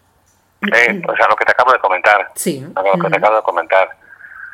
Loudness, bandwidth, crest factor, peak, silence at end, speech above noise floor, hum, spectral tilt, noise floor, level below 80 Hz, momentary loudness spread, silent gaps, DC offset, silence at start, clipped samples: -13 LUFS; 16.5 kHz; 14 dB; 0 dBFS; 0.05 s; 42 dB; none; -4 dB/octave; -56 dBFS; -60 dBFS; 9 LU; none; under 0.1%; 0.6 s; 0.1%